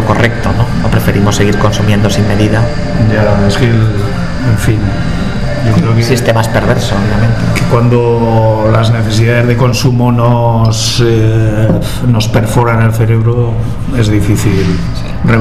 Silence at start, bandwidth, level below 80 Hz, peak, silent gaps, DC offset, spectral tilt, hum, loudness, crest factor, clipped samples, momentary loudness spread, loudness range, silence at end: 0 s; 14.5 kHz; -22 dBFS; 0 dBFS; none; 9%; -6.5 dB/octave; none; -10 LUFS; 10 dB; 0.4%; 5 LU; 2 LU; 0 s